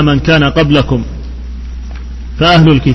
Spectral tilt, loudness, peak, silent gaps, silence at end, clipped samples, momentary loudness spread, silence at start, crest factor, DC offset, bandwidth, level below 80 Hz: -7 dB/octave; -9 LUFS; 0 dBFS; none; 0 s; 0.5%; 19 LU; 0 s; 10 dB; under 0.1%; 6.2 kHz; -22 dBFS